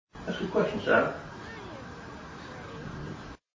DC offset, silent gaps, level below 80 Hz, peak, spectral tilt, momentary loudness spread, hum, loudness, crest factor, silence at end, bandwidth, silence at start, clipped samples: under 0.1%; none; -54 dBFS; -10 dBFS; -6 dB/octave; 18 LU; none; -31 LUFS; 22 dB; 0.2 s; 7.6 kHz; 0.15 s; under 0.1%